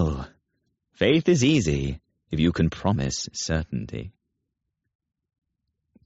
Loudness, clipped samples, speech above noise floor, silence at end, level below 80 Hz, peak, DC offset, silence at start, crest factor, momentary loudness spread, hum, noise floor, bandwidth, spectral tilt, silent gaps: -24 LUFS; under 0.1%; 58 dB; 1.95 s; -40 dBFS; -6 dBFS; under 0.1%; 0 s; 20 dB; 17 LU; none; -81 dBFS; 8 kHz; -5.5 dB/octave; none